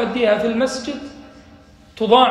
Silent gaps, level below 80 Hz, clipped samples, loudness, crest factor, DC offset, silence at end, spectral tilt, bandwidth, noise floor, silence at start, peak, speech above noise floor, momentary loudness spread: none; -52 dBFS; under 0.1%; -18 LUFS; 18 dB; under 0.1%; 0 s; -4.5 dB/octave; 12 kHz; -46 dBFS; 0 s; 0 dBFS; 29 dB; 16 LU